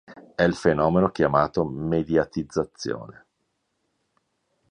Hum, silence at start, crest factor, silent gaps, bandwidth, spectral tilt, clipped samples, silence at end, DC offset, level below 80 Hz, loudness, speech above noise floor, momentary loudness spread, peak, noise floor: none; 0.1 s; 20 dB; none; 10 kHz; -7 dB/octave; under 0.1%; 1.6 s; under 0.1%; -50 dBFS; -23 LUFS; 52 dB; 11 LU; -6 dBFS; -75 dBFS